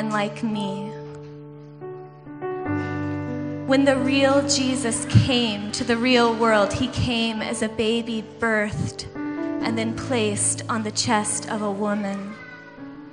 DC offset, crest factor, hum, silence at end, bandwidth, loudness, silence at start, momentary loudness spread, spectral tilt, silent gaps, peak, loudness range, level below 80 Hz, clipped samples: under 0.1%; 20 dB; none; 0 s; 11 kHz; -23 LUFS; 0 s; 20 LU; -4.5 dB/octave; none; -2 dBFS; 6 LU; -50 dBFS; under 0.1%